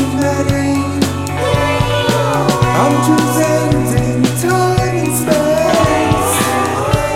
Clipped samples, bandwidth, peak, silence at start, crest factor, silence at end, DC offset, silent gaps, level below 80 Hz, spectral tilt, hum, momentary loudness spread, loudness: under 0.1%; 16.5 kHz; 0 dBFS; 0 s; 12 dB; 0 s; 0.9%; none; -32 dBFS; -5 dB/octave; none; 3 LU; -13 LUFS